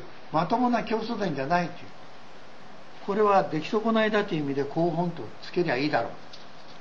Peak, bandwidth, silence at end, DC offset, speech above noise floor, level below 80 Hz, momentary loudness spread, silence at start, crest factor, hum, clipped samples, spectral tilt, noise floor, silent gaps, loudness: -10 dBFS; 7.2 kHz; 0 s; 1%; 23 dB; -62 dBFS; 21 LU; 0 s; 18 dB; none; under 0.1%; -7 dB/octave; -49 dBFS; none; -27 LUFS